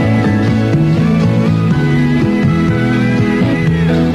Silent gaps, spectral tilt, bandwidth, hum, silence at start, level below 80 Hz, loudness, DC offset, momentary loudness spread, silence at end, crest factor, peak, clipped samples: none; -8 dB/octave; 11.5 kHz; none; 0 s; -30 dBFS; -12 LUFS; 0.2%; 1 LU; 0 s; 10 dB; -2 dBFS; under 0.1%